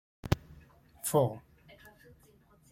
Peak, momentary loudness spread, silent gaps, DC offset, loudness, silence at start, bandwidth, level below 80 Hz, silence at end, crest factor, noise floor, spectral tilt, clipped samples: -10 dBFS; 26 LU; none; under 0.1%; -32 LUFS; 0.25 s; 16.5 kHz; -54 dBFS; 0.85 s; 26 dB; -63 dBFS; -5.5 dB/octave; under 0.1%